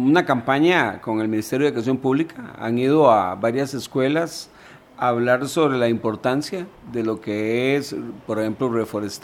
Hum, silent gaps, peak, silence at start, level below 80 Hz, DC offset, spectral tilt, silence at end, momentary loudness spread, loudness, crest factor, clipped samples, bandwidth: none; none; -2 dBFS; 0 s; -60 dBFS; under 0.1%; -6 dB/octave; 0.05 s; 12 LU; -21 LUFS; 20 dB; under 0.1%; 16.5 kHz